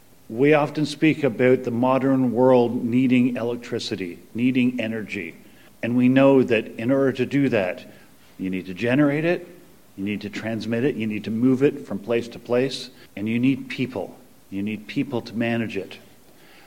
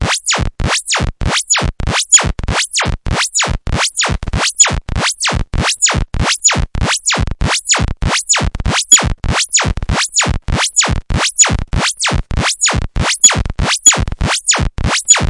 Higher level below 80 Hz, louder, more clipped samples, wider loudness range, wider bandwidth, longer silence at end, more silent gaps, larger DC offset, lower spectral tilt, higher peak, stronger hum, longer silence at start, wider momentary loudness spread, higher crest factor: second, -64 dBFS vs -22 dBFS; second, -22 LUFS vs -12 LUFS; second, under 0.1% vs 0.6%; first, 6 LU vs 2 LU; first, 15.5 kHz vs 12 kHz; first, 0.7 s vs 0 s; neither; first, 0.3% vs under 0.1%; first, -7 dB/octave vs -2 dB/octave; second, -4 dBFS vs 0 dBFS; neither; first, 0.3 s vs 0 s; first, 13 LU vs 8 LU; about the same, 18 dB vs 14 dB